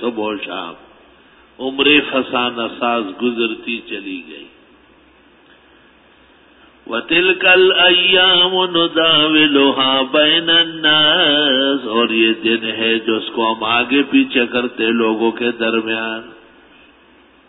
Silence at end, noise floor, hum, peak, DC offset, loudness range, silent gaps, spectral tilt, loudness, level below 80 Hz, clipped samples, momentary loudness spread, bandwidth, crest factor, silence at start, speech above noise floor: 1.15 s; -49 dBFS; none; 0 dBFS; under 0.1%; 12 LU; none; -8 dB/octave; -13 LUFS; -58 dBFS; under 0.1%; 14 LU; 4.1 kHz; 16 dB; 0 s; 34 dB